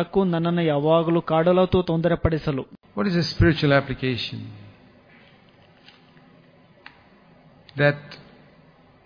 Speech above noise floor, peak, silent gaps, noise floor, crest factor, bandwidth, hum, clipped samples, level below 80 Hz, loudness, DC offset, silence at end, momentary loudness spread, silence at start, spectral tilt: 33 dB; -4 dBFS; none; -54 dBFS; 20 dB; 5.2 kHz; none; under 0.1%; -42 dBFS; -22 LUFS; under 0.1%; 0.9 s; 15 LU; 0 s; -7.5 dB/octave